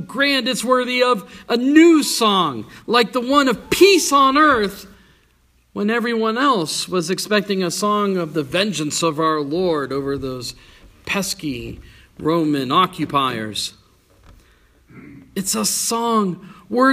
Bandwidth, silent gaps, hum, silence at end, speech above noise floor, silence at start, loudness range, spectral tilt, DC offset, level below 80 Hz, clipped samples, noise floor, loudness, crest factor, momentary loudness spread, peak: 15.5 kHz; none; none; 0 s; 40 dB; 0 s; 8 LU; -3.5 dB/octave; under 0.1%; -50 dBFS; under 0.1%; -58 dBFS; -18 LUFS; 18 dB; 13 LU; 0 dBFS